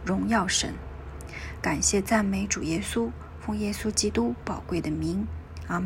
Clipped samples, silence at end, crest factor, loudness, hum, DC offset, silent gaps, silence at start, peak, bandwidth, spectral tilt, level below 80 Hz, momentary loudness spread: under 0.1%; 0 s; 18 dB; -27 LUFS; none; under 0.1%; none; 0 s; -10 dBFS; 16 kHz; -4 dB/octave; -42 dBFS; 14 LU